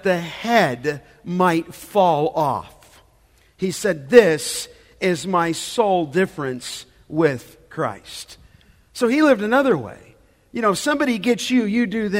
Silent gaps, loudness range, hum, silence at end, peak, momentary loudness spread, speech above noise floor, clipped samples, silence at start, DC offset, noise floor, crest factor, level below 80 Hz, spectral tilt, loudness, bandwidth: none; 4 LU; none; 0 s; 0 dBFS; 17 LU; 37 dB; under 0.1%; 0.05 s; under 0.1%; -56 dBFS; 20 dB; -56 dBFS; -5 dB/octave; -20 LUFS; 16 kHz